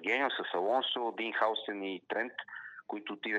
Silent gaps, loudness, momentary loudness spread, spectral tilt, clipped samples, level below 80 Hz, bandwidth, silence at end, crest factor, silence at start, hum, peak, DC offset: none; -34 LUFS; 12 LU; -4 dB/octave; under 0.1%; under -90 dBFS; 8.8 kHz; 0 s; 18 dB; 0 s; none; -16 dBFS; under 0.1%